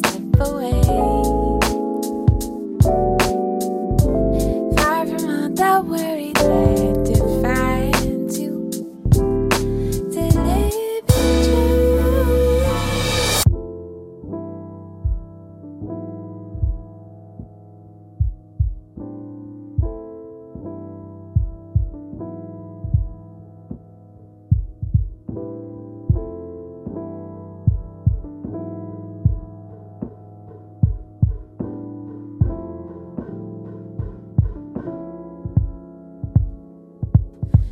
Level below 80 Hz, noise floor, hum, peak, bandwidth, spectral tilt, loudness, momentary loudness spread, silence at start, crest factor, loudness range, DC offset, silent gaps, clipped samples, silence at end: -28 dBFS; -44 dBFS; none; -2 dBFS; 16 kHz; -6 dB/octave; -20 LUFS; 19 LU; 0 s; 20 dB; 12 LU; under 0.1%; none; under 0.1%; 0 s